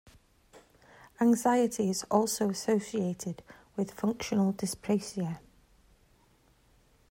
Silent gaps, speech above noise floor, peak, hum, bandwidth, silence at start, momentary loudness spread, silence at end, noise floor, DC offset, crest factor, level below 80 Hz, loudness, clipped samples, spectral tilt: none; 36 dB; -12 dBFS; none; 16 kHz; 0.55 s; 12 LU; 1.75 s; -65 dBFS; under 0.1%; 20 dB; -66 dBFS; -30 LUFS; under 0.1%; -5.5 dB/octave